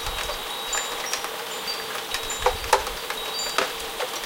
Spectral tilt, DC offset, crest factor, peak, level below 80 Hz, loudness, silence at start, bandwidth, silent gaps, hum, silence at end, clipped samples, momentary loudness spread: -0.5 dB/octave; under 0.1%; 26 dB; -2 dBFS; -44 dBFS; -26 LUFS; 0 s; 17 kHz; none; none; 0 s; under 0.1%; 6 LU